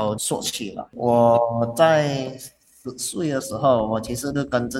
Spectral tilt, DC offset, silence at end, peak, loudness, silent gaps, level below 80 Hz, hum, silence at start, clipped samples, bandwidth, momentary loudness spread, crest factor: -5 dB/octave; under 0.1%; 0 s; -4 dBFS; -21 LUFS; none; -52 dBFS; none; 0 s; under 0.1%; 16.5 kHz; 16 LU; 18 dB